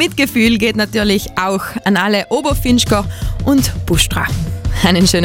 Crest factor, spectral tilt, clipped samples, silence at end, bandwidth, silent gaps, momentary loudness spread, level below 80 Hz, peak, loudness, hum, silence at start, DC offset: 14 dB; -4.5 dB/octave; under 0.1%; 0 s; 17 kHz; none; 6 LU; -26 dBFS; 0 dBFS; -14 LUFS; none; 0 s; under 0.1%